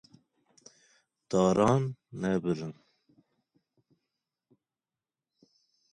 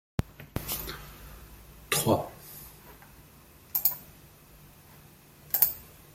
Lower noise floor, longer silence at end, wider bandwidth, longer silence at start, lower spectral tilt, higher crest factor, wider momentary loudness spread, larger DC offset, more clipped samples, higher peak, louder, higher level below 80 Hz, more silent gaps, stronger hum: first, under -90 dBFS vs -54 dBFS; first, 3.2 s vs 0.25 s; second, 10.5 kHz vs 16.5 kHz; first, 1.3 s vs 0.2 s; first, -7 dB/octave vs -3.5 dB/octave; second, 22 dB vs 34 dB; second, 12 LU vs 26 LU; neither; neither; second, -12 dBFS vs 0 dBFS; about the same, -29 LUFS vs -29 LUFS; second, -64 dBFS vs -52 dBFS; neither; neither